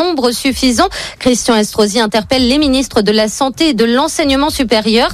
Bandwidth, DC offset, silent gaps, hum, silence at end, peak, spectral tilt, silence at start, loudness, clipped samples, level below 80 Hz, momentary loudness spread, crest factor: 14.5 kHz; under 0.1%; none; none; 0 s; 0 dBFS; -3.5 dB/octave; 0 s; -12 LUFS; under 0.1%; -34 dBFS; 3 LU; 12 dB